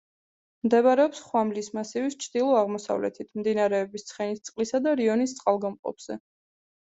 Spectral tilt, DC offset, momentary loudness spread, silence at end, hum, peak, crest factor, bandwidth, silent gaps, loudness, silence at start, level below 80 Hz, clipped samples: -5 dB/octave; under 0.1%; 12 LU; 0.75 s; none; -10 dBFS; 18 dB; 8.2 kHz; 5.79-5.83 s; -26 LUFS; 0.65 s; -74 dBFS; under 0.1%